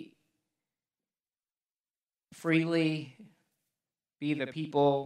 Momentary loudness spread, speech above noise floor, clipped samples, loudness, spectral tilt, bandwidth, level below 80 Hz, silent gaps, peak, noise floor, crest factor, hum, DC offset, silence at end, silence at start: 11 LU; over 61 dB; under 0.1%; -31 LUFS; -7 dB/octave; 12 kHz; -84 dBFS; 1.80-1.84 s; -14 dBFS; under -90 dBFS; 20 dB; none; under 0.1%; 0 s; 0 s